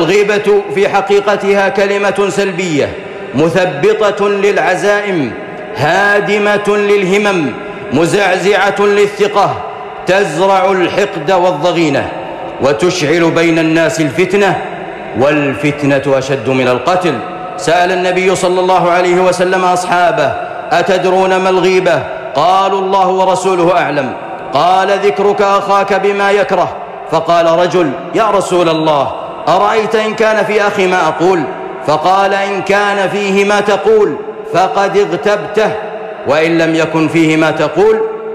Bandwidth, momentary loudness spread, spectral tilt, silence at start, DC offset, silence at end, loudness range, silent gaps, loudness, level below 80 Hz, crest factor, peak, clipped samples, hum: 13.5 kHz; 7 LU; -5 dB/octave; 0 s; under 0.1%; 0 s; 1 LU; none; -11 LUFS; -48 dBFS; 8 dB; -2 dBFS; under 0.1%; none